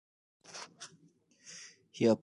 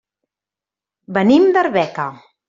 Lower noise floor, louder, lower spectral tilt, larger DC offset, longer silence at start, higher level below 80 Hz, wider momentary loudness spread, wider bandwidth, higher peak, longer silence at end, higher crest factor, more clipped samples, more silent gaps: second, -67 dBFS vs -88 dBFS; second, -38 LUFS vs -15 LUFS; second, -5.5 dB/octave vs -7 dB/octave; neither; second, 0.55 s vs 1.1 s; second, -78 dBFS vs -60 dBFS; first, 20 LU vs 13 LU; first, 11.5 kHz vs 7.6 kHz; second, -16 dBFS vs -2 dBFS; second, 0.05 s vs 0.35 s; first, 22 dB vs 16 dB; neither; neither